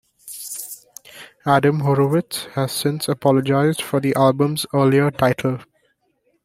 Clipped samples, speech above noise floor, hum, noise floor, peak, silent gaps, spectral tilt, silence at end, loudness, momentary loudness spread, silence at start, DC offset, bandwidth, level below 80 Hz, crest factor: under 0.1%; 48 dB; none; -66 dBFS; -2 dBFS; none; -6 dB/octave; 0.8 s; -19 LUFS; 16 LU; 0.25 s; under 0.1%; 16 kHz; -56 dBFS; 18 dB